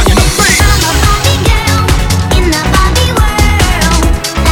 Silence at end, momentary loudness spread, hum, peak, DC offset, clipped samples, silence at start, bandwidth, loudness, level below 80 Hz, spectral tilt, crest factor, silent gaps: 0 s; 3 LU; none; 0 dBFS; under 0.1%; 0.5%; 0 s; 19 kHz; -9 LUFS; -12 dBFS; -4 dB/octave; 8 dB; none